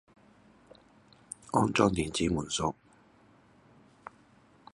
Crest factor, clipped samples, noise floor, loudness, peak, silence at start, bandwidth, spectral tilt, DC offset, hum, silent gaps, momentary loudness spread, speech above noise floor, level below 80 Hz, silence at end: 26 dB; under 0.1%; -61 dBFS; -29 LUFS; -8 dBFS; 1.55 s; 11.5 kHz; -4.5 dB/octave; under 0.1%; none; none; 25 LU; 33 dB; -54 dBFS; 2 s